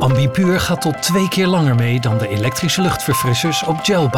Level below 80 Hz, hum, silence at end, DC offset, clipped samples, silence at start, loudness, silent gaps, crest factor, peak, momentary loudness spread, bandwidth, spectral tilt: -42 dBFS; none; 0 s; under 0.1%; under 0.1%; 0 s; -16 LUFS; none; 10 dB; -6 dBFS; 3 LU; 18 kHz; -5 dB/octave